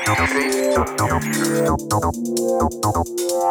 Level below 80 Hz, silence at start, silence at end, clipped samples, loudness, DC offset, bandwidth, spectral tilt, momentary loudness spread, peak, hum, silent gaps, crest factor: -36 dBFS; 0 s; 0 s; under 0.1%; -20 LUFS; under 0.1%; over 20 kHz; -4.5 dB/octave; 4 LU; -4 dBFS; none; none; 16 dB